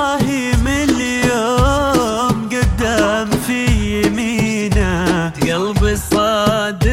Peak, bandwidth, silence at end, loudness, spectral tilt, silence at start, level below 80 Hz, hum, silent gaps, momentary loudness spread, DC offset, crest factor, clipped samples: -2 dBFS; 16.5 kHz; 0 s; -16 LUFS; -5 dB/octave; 0 s; -24 dBFS; none; none; 3 LU; under 0.1%; 14 dB; under 0.1%